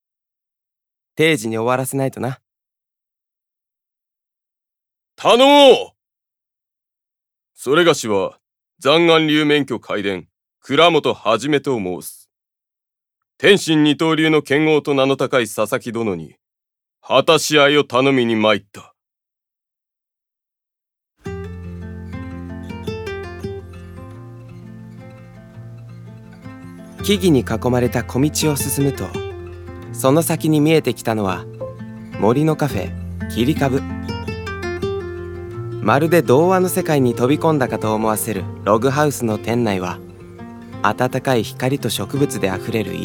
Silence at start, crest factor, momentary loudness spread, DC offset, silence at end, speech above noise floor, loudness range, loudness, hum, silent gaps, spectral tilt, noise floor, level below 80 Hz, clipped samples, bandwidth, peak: 1.15 s; 18 dB; 21 LU; under 0.1%; 0 s; 70 dB; 15 LU; -17 LUFS; none; none; -5 dB/octave; -86 dBFS; -48 dBFS; under 0.1%; 19.5 kHz; 0 dBFS